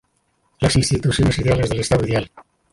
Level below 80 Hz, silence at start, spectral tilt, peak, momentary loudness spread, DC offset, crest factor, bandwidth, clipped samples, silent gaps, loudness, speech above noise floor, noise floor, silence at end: -34 dBFS; 0.6 s; -5.5 dB/octave; -4 dBFS; 5 LU; under 0.1%; 16 dB; 11.5 kHz; under 0.1%; none; -19 LUFS; 48 dB; -66 dBFS; 0.3 s